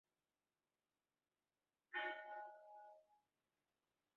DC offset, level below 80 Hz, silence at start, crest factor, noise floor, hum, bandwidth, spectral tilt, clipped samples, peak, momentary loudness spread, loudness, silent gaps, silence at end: under 0.1%; under -90 dBFS; 1.9 s; 22 dB; under -90 dBFS; none; 6.4 kHz; 3 dB/octave; under 0.1%; -34 dBFS; 16 LU; -50 LUFS; none; 1 s